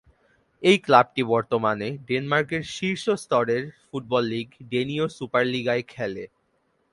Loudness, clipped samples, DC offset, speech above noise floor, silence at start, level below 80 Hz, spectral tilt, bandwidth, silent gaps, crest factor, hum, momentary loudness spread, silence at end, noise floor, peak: -24 LUFS; under 0.1%; under 0.1%; 45 dB; 0.6 s; -62 dBFS; -5.5 dB/octave; 11.5 kHz; none; 24 dB; none; 13 LU; 0.65 s; -69 dBFS; -2 dBFS